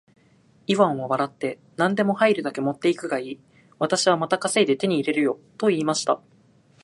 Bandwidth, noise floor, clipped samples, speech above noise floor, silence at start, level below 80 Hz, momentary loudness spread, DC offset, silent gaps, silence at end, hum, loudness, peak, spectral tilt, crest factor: 11.5 kHz; -58 dBFS; under 0.1%; 35 dB; 0.7 s; -72 dBFS; 9 LU; under 0.1%; none; 0.65 s; none; -23 LUFS; -4 dBFS; -4.5 dB/octave; 18 dB